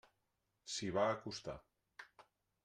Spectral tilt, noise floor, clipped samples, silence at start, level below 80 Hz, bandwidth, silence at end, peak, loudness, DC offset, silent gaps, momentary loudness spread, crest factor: -4 dB/octave; -86 dBFS; under 0.1%; 0.65 s; -72 dBFS; 11.5 kHz; 0.4 s; -22 dBFS; -41 LUFS; under 0.1%; none; 22 LU; 22 dB